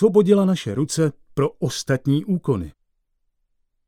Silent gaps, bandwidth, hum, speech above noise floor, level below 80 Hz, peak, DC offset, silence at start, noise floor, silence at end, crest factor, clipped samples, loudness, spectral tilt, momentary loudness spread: none; 15 kHz; none; 51 dB; -52 dBFS; -4 dBFS; under 0.1%; 0 s; -70 dBFS; 1.2 s; 18 dB; under 0.1%; -21 LUFS; -6.5 dB/octave; 9 LU